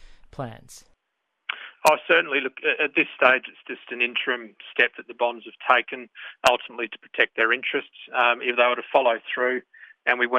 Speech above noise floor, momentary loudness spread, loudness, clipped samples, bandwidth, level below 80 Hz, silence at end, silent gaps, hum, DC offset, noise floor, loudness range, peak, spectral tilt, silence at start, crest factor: 54 dB; 15 LU; -22 LUFS; under 0.1%; 12 kHz; -62 dBFS; 0 s; none; none; under 0.1%; -78 dBFS; 2 LU; -2 dBFS; -2.5 dB/octave; 0.4 s; 22 dB